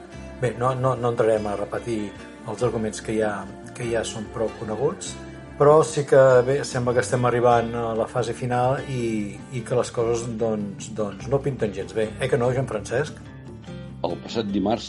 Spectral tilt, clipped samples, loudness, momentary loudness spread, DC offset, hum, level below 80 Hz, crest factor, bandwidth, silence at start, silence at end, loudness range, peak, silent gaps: -6 dB/octave; under 0.1%; -23 LUFS; 15 LU; under 0.1%; none; -48 dBFS; 18 dB; 11.5 kHz; 0 s; 0 s; 8 LU; -4 dBFS; none